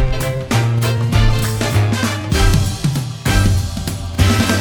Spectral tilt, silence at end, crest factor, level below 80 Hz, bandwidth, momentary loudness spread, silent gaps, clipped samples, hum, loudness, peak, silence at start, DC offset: -5 dB/octave; 0 s; 14 dB; -22 dBFS; over 20 kHz; 6 LU; none; under 0.1%; none; -17 LUFS; 0 dBFS; 0 s; under 0.1%